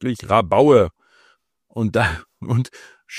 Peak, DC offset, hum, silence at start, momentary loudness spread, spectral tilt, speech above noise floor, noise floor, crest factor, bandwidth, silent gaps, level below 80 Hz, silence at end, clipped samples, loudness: -2 dBFS; under 0.1%; none; 0 s; 17 LU; -7 dB/octave; 42 dB; -59 dBFS; 18 dB; 13.5 kHz; none; -44 dBFS; 0 s; under 0.1%; -18 LUFS